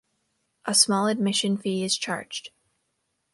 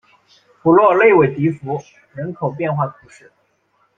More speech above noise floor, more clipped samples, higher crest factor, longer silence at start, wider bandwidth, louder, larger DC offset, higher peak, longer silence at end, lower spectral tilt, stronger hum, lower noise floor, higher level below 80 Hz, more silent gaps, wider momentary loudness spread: first, 51 dB vs 46 dB; neither; about the same, 22 dB vs 18 dB; about the same, 0.65 s vs 0.65 s; first, 12 kHz vs 7.4 kHz; second, -23 LUFS vs -16 LUFS; neither; second, -4 dBFS vs 0 dBFS; second, 0.85 s vs 1.05 s; second, -3 dB/octave vs -9 dB/octave; neither; first, -76 dBFS vs -62 dBFS; second, -74 dBFS vs -58 dBFS; neither; about the same, 16 LU vs 17 LU